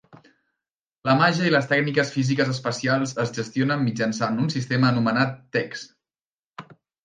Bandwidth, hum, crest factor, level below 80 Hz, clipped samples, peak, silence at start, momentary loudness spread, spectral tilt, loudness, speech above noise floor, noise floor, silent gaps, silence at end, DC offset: 9.6 kHz; none; 18 dB; -66 dBFS; under 0.1%; -6 dBFS; 1.05 s; 8 LU; -5.5 dB/octave; -23 LUFS; over 68 dB; under -90 dBFS; 6.25-6.54 s; 0.3 s; under 0.1%